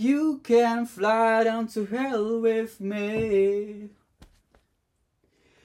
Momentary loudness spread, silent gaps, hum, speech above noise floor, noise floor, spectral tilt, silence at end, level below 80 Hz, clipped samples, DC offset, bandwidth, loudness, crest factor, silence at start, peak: 9 LU; none; none; 49 dB; -73 dBFS; -6 dB/octave; 1.75 s; -60 dBFS; under 0.1%; under 0.1%; 15.5 kHz; -24 LUFS; 14 dB; 0 s; -10 dBFS